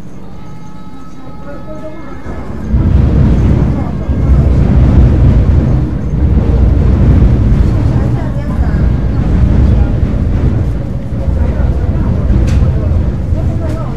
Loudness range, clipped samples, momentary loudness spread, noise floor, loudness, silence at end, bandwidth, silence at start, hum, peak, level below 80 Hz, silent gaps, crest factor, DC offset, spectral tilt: 4 LU; 0.2%; 19 LU; -30 dBFS; -11 LUFS; 0 s; 6.8 kHz; 0 s; none; 0 dBFS; -14 dBFS; none; 10 dB; 7%; -9.5 dB/octave